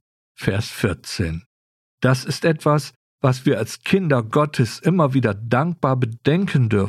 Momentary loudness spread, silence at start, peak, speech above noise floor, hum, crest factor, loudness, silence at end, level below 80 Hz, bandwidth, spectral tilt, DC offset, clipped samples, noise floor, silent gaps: 7 LU; 0.4 s; -4 dBFS; over 71 dB; none; 16 dB; -20 LUFS; 0 s; -48 dBFS; 14 kHz; -6.5 dB/octave; under 0.1%; under 0.1%; under -90 dBFS; 1.46-1.98 s, 2.96-3.18 s